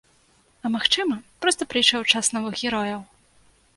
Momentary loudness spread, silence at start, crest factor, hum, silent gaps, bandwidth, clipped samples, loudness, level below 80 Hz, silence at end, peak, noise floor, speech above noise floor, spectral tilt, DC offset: 11 LU; 0.65 s; 24 dB; none; none; 11.5 kHz; under 0.1%; -22 LUFS; -60 dBFS; 0.75 s; -2 dBFS; -60 dBFS; 37 dB; -1.5 dB/octave; under 0.1%